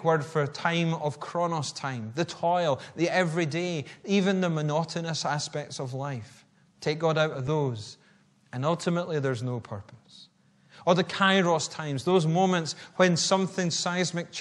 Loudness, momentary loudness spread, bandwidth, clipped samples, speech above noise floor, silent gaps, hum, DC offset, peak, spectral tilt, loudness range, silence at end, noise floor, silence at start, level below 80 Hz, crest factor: -27 LUFS; 11 LU; 11 kHz; under 0.1%; 34 dB; none; none; under 0.1%; -6 dBFS; -5 dB/octave; 6 LU; 0 s; -61 dBFS; 0 s; -70 dBFS; 20 dB